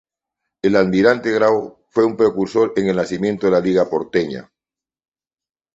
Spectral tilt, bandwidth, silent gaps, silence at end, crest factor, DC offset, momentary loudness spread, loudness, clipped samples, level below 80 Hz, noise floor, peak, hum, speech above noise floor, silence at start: -6.5 dB/octave; 8 kHz; none; 1.35 s; 18 dB; under 0.1%; 7 LU; -17 LUFS; under 0.1%; -54 dBFS; -90 dBFS; -2 dBFS; none; 73 dB; 0.65 s